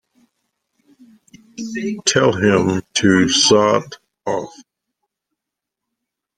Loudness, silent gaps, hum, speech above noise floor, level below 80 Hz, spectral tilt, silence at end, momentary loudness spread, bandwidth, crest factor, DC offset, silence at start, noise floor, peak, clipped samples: -16 LUFS; none; none; 67 dB; -56 dBFS; -3.5 dB/octave; 1.75 s; 17 LU; 10.5 kHz; 18 dB; under 0.1%; 1.6 s; -82 dBFS; -2 dBFS; under 0.1%